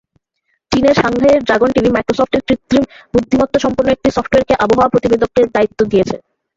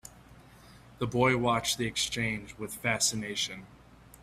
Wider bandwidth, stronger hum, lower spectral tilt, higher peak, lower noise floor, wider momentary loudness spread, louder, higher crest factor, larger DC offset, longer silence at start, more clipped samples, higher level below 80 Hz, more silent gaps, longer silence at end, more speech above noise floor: second, 7.8 kHz vs 16 kHz; neither; first, -6 dB/octave vs -3 dB/octave; first, 0 dBFS vs -12 dBFS; first, -67 dBFS vs -54 dBFS; second, 4 LU vs 12 LU; first, -13 LUFS vs -29 LUFS; second, 12 dB vs 20 dB; neither; first, 0.7 s vs 0.05 s; neither; first, -38 dBFS vs -56 dBFS; neither; first, 0.4 s vs 0.05 s; first, 54 dB vs 24 dB